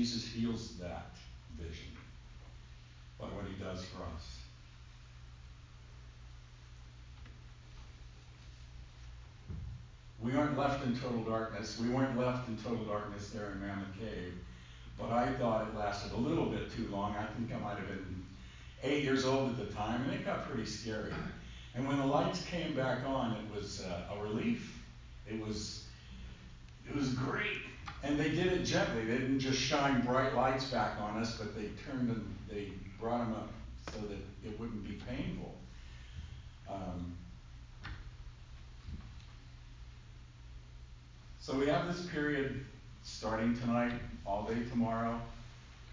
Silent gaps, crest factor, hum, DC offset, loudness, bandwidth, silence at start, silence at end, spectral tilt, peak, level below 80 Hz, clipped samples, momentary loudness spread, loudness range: none; 20 dB; none; under 0.1%; -37 LUFS; 7.6 kHz; 0 s; 0 s; -5.5 dB/octave; -18 dBFS; -52 dBFS; under 0.1%; 22 LU; 18 LU